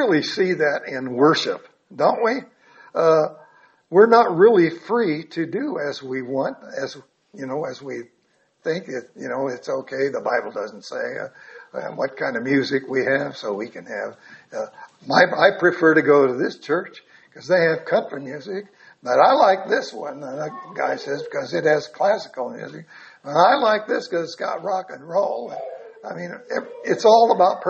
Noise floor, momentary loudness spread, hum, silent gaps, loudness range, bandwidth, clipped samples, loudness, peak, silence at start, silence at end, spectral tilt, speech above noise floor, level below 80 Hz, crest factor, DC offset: -64 dBFS; 18 LU; none; none; 9 LU; 8 kHz; under 0.1%; -20 LUFS; -2 dBFS; 0 s; 0 s; -5.5 dB/octave; 44 dB; -72 dBFS; 20 dB; under 0.1%